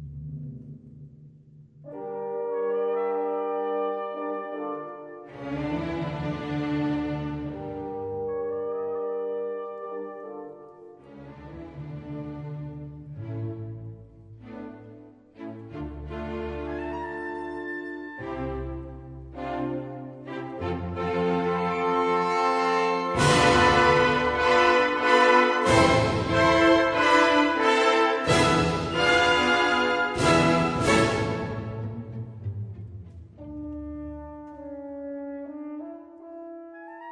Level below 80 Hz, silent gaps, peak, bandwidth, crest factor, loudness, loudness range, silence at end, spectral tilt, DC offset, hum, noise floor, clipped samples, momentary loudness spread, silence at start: -48 dBFS; none; -6 dBFS; 10.5 kHz; 20 dB; -24 LUFS; 18 LU; 0 s; -5 dB/octave; under 0.1%; none; -51 dBFS; under 0.1%; 22 LU; 0 s